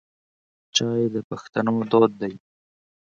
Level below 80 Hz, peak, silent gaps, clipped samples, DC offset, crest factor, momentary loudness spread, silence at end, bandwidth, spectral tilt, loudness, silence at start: -66 dBFS; -4 dBFS; 1.24-1.30 s; under 0.1%; under 0.1%; 22 dB; 12 LU; 0.8 s; 7.6 kHz; -4.5 dB/octave; -23 LUFS; 0.75 s